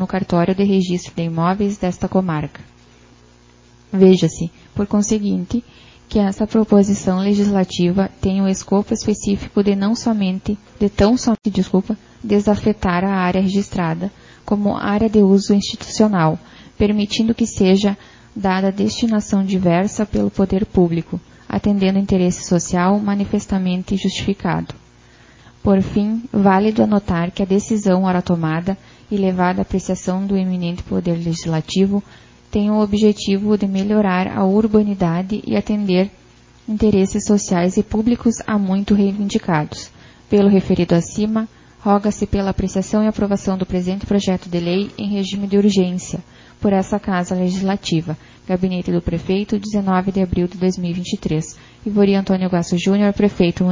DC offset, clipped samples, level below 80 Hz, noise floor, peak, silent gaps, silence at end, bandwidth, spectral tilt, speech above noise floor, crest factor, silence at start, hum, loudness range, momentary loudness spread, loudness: under 0.1%; under 0.1%; -40 dBFS; -48 dBFS; 0 dBFS; none; 0 s; 7.6 kHz; -6.5 dB/octave; 31 dB; 16 dB; 0 s; none; 3 LU; 8 LU; -18 LUFS